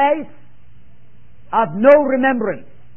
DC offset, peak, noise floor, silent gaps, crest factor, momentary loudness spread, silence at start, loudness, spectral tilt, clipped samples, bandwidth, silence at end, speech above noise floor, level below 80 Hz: 2%; 0 dBFS; -50 dBFS; none; 18 dB; 16 LU; 0 s; -15 LUFS; -8.5 dB/octave; under 0.1%; 3.3 kHz; 0.35 s; 36 dB; -54 dBFS